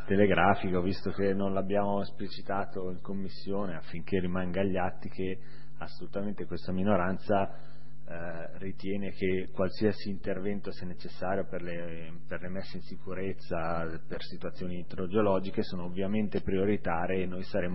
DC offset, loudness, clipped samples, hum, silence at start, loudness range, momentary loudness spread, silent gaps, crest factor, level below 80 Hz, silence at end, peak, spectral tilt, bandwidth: 3%; -33 LUFS; under 0.1%; none; 0 s; 6 LU; 13 LU; none; 24 dB; -54 dBFS; 0 s; -8 dBFS; -10.5 dB/octave; 5.8 kHz